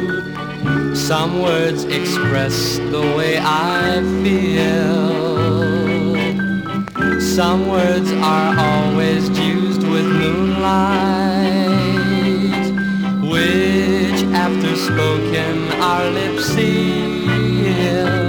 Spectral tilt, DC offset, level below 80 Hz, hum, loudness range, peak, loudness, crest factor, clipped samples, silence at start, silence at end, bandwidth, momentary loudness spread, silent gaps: -5.5 dB/octave; under 0.1%; -42 dBFS; none; 1 LU; -4 dBFS; -16 LUFS; 12 dB; under 0.1%; 0 s; 0 s; over 20 kHz; 3 LU; none